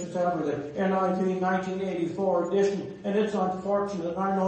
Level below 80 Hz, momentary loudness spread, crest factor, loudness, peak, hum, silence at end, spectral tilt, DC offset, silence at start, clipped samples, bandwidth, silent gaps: -64 dBFS; 5 LU; 14 dB; -28 LUFS; -14 dBFS; none; 0 s; -7 dB/octave; under 0.1%; 0 s; under 0.1%; 8.6 kHz; none